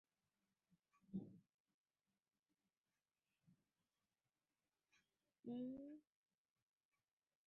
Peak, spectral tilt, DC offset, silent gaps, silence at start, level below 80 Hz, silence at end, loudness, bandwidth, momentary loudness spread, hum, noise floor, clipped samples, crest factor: -40 dBFS; -10 dB/octave; under 0.1%; 1.54-1.65 s, 1.74-1.84 s, 2.39-2.43 s, 5.39-5.43 s; 0.7 s; under -90 dBFS; 1.45 s; -55 LUFS; 3.8 kHz; 12 LU; none; under -90 dBFS; under 0.1%; 22 dB